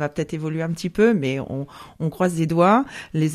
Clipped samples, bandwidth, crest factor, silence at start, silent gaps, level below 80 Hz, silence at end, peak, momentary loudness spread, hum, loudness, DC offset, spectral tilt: under 0.1%; 14 kHz; 18 dB; 0 s; none; -52 dBFS; 0 s; -4 dBFS; 12 LU; none; -22 LUFS; under 0.1%; -7 dB/octave